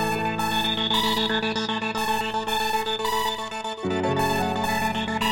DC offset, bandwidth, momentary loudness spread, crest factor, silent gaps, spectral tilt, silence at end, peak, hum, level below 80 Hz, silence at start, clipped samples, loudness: 0.9%; 17 kHz; 5 LU; 14 dB; none; -3.5 dB/octave; 0 s; -10 dBFS; none; -50 dBFS; 0 s; under 0.1%; -24 LUFS